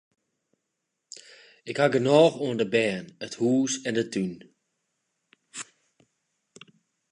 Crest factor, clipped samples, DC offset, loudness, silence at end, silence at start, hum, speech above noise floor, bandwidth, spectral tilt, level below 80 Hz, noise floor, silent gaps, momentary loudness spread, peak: 22 dB; under 0.1%; under 0.1%; -25 LUFS; 1.5 s; 1.65 s; none; 57 dB; 11 kHz; -5 dB/octave; -74 dBFS; -81 dBFS; none; 25 LU; -6 dBFS